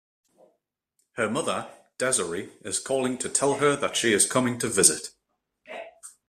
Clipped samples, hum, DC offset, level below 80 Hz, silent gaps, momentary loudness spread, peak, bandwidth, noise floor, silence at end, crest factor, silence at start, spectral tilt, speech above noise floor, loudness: under 0.1%; none; under 0.1%; -66 dBFS; none; 21 LU; -2 dBFS; 15 kHz; -75 dBFS; 0.2 s; 26 dB; 1.15 s; -2.5 dB/octave; 50 dB; -24 LUFS